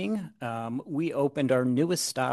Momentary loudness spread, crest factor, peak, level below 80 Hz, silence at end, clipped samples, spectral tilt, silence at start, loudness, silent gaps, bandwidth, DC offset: 9 LU; 16 dB; -12 dBFS; -74 dBFS; 0 s; under 0.1%; -5 dB/octave; 0 s; -28 LUFS; none; 12.5 kHz; under 0.1%